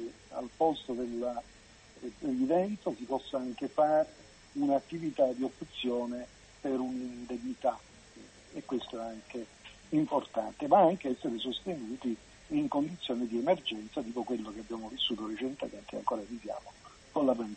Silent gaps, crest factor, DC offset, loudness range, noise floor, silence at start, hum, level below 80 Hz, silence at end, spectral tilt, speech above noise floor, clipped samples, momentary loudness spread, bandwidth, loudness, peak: none; 22 dB; under 0.1%; 6 LU; -55 dBFS; 0 s; none; -64 dBFS; 0 s; -5.5 dB/octave; 22 dB; under 0.1%; 14 LU; 8.4 kHz; -34 LUFS; -12 dBFS